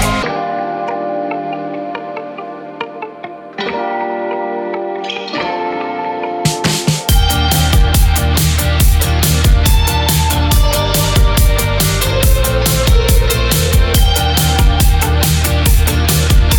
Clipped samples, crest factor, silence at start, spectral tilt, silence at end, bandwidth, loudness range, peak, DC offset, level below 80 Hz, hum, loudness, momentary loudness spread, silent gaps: under 0.1%; 12 dB; 0 s; -4 dB/octave; 0 s; 19 kHz; 10 LU; 0 dBFS; under 0.1%; -16 dBFS; none; -14 LUFS; 11 LU; none